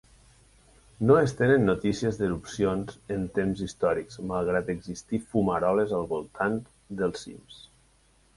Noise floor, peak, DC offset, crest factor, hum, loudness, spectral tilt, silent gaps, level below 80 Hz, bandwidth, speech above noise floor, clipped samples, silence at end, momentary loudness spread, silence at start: -62 dBFS; -8 dBFS; under 0.1%; 18 dB; none; -27 LUFS; -6.5 dB/octave; none; -52 dBFS; 11.5 kHz; 36 dB; under 0.1%; 0.8 s; 12 LU; 1 s